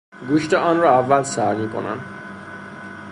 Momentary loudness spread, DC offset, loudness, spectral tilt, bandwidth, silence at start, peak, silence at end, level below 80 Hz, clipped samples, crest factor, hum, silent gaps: 19 LU; under 0.1%; -19 LUFS; -5.5 dB/octave; 11.5 kHz; 0.15 s; -2 dBFS; 0 s; -58 dBFS; under 0.1%; 18 dB; none; none